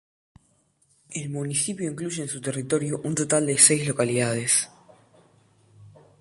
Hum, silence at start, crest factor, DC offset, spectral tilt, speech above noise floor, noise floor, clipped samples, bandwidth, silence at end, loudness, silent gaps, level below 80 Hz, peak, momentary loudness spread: none; 1.1 s; 26 dB; under 0.1%; -3.5 dB/octave; 41 dB; -66 dBFS; under 0.1%; 12 kHz; 0.3 s; -23 LUFS; none; -64 dBFS; -2 dBFS; 15 LU